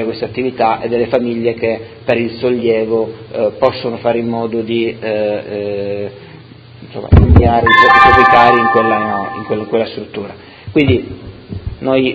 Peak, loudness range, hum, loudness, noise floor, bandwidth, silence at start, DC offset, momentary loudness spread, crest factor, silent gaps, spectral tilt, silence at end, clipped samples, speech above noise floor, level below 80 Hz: 0 dBFS; 8 LU; none; -13 LUFS; -36 dBFS; 8 kHz; 0 s; under 0.1%; 19 LU; 14 dB; none; -8 dB/octave; 0 s; 0.4%; 24 dB; -24 dBFS